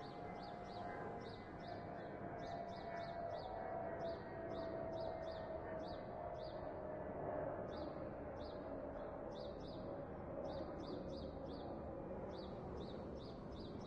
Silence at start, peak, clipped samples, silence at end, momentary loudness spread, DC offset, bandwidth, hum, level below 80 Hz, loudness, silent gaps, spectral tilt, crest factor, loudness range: 0 s; -32 dBFS; under 0.1%; 0 s; 4 LU; under 0.1%; 9.2 kHz; none; -62 dBFS; -49 LUFS; none; -7.5 dB/octave; 16 dB; 2 LU